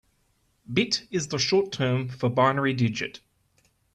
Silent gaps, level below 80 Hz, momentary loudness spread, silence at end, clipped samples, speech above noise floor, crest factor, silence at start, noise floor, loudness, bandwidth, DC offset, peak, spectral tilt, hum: none; -62 dBFS; 7 LU; 0.8 s; under 0.1%; 44 dB; 20 dB; 0.7 s; -69 dBFS; -25 LUFS; 9.8 kHz; under 0.1%; -8 dBFS; -5 dB/octave; none